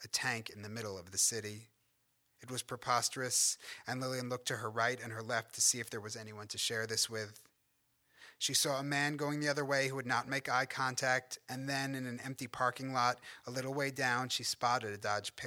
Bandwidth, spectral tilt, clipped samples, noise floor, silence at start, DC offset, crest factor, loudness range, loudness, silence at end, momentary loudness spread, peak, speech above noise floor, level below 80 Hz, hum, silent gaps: over 20 kHz; -2 dB/octave; under 0.1%; -77 dBFS; 0 s; under 0.1%; 20 dB; 2 LU; -35 LUFS; 0 s; 12 LU; -16 dBFS; 41 dB; -78 dBFS; none; none